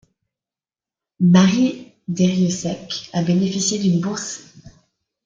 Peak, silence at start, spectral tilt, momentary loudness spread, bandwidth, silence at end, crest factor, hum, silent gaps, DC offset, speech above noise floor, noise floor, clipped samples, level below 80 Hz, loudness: -2 dBFS; 1.2 s; -5.5 dB/octave; 15 LU; 7.6 kHz; 0.55 s; 18 dB; none; none; under 0.1%; over 72 dB; under -90 dBFS; under 0.1%; -58 dBFS; -19 LUFS